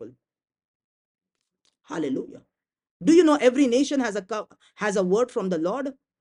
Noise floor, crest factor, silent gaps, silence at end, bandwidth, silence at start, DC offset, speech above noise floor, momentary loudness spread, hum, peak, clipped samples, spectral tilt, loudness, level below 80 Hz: -73 dBFS; 20 dB; 0.65-1.15 s, 2.91-3.00 s; 0.3 s; 11 kHz; 0 s; under 0.1%; 50 dB; 15 LU; none; -6 dBFS; under 0.1%; -5 dB/octave; -23 LUFS; -70 dBFS